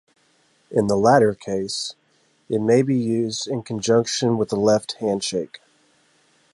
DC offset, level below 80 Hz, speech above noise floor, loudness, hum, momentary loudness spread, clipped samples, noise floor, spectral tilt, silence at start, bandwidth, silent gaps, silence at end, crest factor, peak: under 0.1%; -58 dBFS; 42 dB; -21 LUFS; none; 10 LU; under 0.1%; -62 dBFS; -5 dB/octave; 0.7 s; 11.5 kHz; none; 0.95 s; 20 dB; -2 dBFS